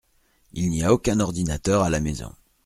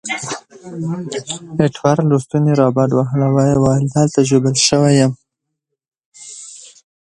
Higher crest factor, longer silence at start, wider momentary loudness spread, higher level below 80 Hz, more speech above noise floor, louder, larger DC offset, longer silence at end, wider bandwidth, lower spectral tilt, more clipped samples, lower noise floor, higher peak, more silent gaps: about the same, 20 dB vs 16 dB; first, 0.55 s vs 0.05 s; second, 14 LU vs 19 LU; first, -40 dBFS vs -50 dBFS; second, 40 dB vs 62 dB; second, -23 LUFS vs -15 LUFS; neither; about the same, 0.35 s vs 0.35 s; first, 15.5 kHz vs 11 kHz; about the same, -6 dB/octave vs -5.5 dB/octave; neither; second, -63 dBFS vs -77 dBFS; second, -4 dBFS vs 0 dBFS; second, none vs 5.88-5.92 s, 6.06-6.12 s